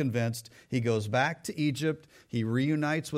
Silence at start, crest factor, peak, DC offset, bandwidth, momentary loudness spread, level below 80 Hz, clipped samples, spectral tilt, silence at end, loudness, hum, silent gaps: 0 s; 16 dB; -14 dBFS; under 0.1%; 16 kHz; 7 LU; -68 dBFS; under 0.1%; -6 dB/octave; 0 s; -30 LUFS; none; none